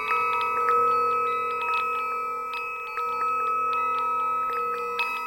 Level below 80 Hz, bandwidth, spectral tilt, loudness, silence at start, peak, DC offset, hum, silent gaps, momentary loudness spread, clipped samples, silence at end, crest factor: -66 dBFS; 16.5 kHz; -2.5 dB/octave; -25 LUFS; 0 s; -10 dBFS; under 0.1%; none; none; 8 LU; under 0.1%; 0 s; 16 dB